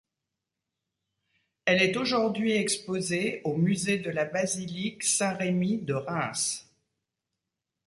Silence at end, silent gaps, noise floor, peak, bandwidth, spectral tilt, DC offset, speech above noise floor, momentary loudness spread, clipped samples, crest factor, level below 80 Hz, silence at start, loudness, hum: 1.25 s; none; -86 dBFS; -10 dBFS; 11.5 kHz; -4 dB/octave; under 0.1%; 59 dB; 7 LU; under 0.1%; 20 dB; -68 dBFS; 1.65 s; -27 LUFS; none